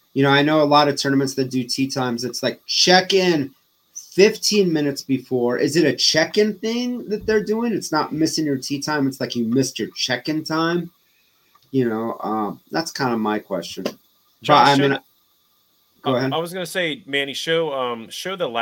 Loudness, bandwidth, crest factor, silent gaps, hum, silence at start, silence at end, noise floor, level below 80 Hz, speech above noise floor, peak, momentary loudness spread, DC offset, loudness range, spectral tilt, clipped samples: -20 LUFS; 17 kHz; 20 dB; none; none; 0.15 s; 0 s; -62 dBFS; -60 dBFS; 42 dB; 0 dBFS; 11 LU; under 0.1%; 6 LU; -4 dB/octave; under 0.1%